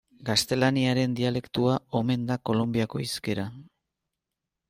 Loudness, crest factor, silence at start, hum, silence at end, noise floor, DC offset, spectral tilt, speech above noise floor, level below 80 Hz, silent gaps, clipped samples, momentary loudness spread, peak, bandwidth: -26 LUFS; 18 dB; 0.2 s; none; 1.05 s; -86 dBFS; under 0.1%; -5.5 dB/octave; 60 dB; -60 dBFS; none; under 0.1%; 7 LU; -10 dBFS; 16 kHz